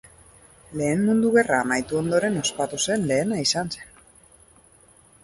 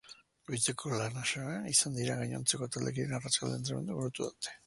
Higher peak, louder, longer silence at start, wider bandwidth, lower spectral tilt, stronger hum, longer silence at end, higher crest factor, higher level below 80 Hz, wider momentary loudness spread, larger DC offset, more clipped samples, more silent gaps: first, -4 dBFS vs -14 dBFS; first, -22 LUFS vs -34 LUFS; first, 0.7 s vs 0.05 s; about the same, 11.5 kHz vs 12 kHz; about the same, -4 dB/octave vs -3 dB/octave; neither; first, 1.4 s vs 0.1 s; about the same, 20 dB vs 22 dB; first, -56 dBFS vs -68 dBFS; about the same, 8 LU vs 9 LU; neither; neither; neither